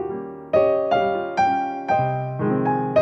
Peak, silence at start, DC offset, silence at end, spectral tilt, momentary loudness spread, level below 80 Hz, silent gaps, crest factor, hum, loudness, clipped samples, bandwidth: -6 dBFS; 0 s; under 0.1%; 0 s; -7.5 dB/octave; 5 LU; -56 dBFS; none; 14 dB; none; -21 LUFS; under 0.1%; 8 kHz